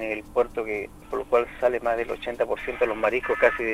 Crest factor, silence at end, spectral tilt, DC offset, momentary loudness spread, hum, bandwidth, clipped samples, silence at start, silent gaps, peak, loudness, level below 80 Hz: 20 dB; 0 s; -5 dB/octave; under 0.1%; 9 LU; none; 15 kHz; under 0.1%; 0 s; none; -6 dBFS; -26 LUFS; -48 dBFS